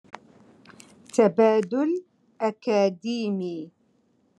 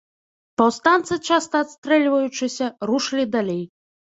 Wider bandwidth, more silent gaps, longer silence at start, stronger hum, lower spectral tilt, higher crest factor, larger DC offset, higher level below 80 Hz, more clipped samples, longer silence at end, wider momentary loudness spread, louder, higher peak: first, 11 kHz vs 8 kHz; second, none vs 1.78-1.82 s; first, 1.15 s vs 0.6 s; neither; first, -6 dB/octave vs -4 dB/octave; about the same, 20 dB vs 20 dB; neither; second, -82 dBFS vs -64 dBFS; neither; first, 0.7 s vs 0.5 s; first, 13 LU vs 9 LU; second, -24 LUFS vs -21 LUFS; second, -6 dBFS vs -2 dBFS